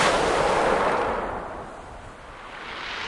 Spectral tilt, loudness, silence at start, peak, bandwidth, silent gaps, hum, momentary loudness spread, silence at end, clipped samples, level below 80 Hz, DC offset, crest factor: -3.5 dB/octave; -24 LUFS; 0 s; -8 dBFS; 11.5 kHz; none; none; 20 LU; 0 s; under 0.1%; -44 dBFS; under 0.1%; 18 dB